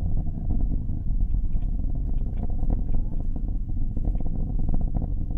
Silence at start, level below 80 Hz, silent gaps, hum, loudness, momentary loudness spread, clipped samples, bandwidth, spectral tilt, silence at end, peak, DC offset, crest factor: 0 s; -24 dBFS; none; none; -30 LUFS; 3 LU; under 0.1%; 1.1 kHz; -12.5 dB/octave; 0 s; -12 dBFS; under 0.1%; 10 dB